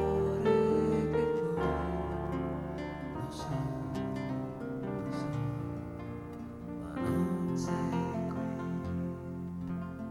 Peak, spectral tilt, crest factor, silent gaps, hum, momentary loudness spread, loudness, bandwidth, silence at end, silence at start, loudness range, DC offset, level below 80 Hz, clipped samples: -16 dBFS; -8 dB/octave; 18 dB; none; none; 11 LU; -34 LUFS; 13 kHz; 0 s; 0 s; 5 LU; under 0.1%; -50 dBFS; under 0.1%